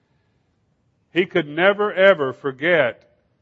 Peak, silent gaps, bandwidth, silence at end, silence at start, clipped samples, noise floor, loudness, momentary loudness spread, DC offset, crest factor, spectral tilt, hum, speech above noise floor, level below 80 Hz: 0 dBFS; none; 6 kHz; 0.5 s; 1.15 s; under 0.1%; -66 dBFS; -19 LUFS; 8 LU; under 0.1%; 20 dB; -7 dB/octave; none; 47 dB; -72 dBFS